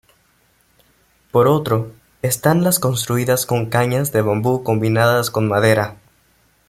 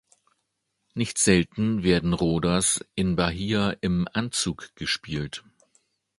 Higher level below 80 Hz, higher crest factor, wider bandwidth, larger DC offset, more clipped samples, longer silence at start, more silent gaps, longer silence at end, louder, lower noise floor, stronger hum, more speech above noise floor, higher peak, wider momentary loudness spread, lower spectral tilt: second, -52 dBFS vs -46 dBFS; about the same, 18 dB vs 22 dB; first, 16 kHz vs 11.5 kHz; neither; neither; first, 1.35 s vs 0.95 s; neither; about the same, 0.75 s vs 0.8 s; first, -17 LUFS vs -25 LUFS; second, -59 dBFS vs -77 dBFS; neither; second, 42 dB vs 53 dB; first, 0 dBFS vs -4 dBFS; second, 6 LU vs 11 LU; about the same, -5 dB/octave vs -4 dB/octave